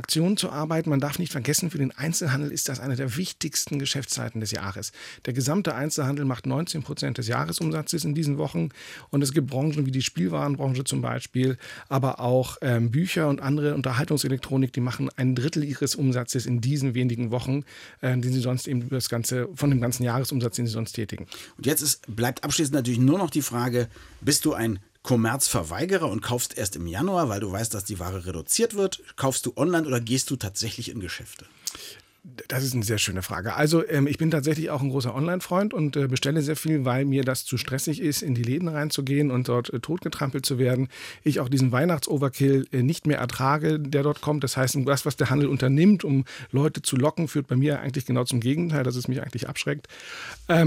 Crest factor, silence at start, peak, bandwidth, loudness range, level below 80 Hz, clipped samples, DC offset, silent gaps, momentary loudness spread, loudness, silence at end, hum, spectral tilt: 16 dB; 0 s; -8 dBFS; 16.5 kHz; 4 LU; -58 dBFS; under 0.1%; under 0.1%; none; 7 LU; -25 LUFS; 0 s; none; -5 dB/octave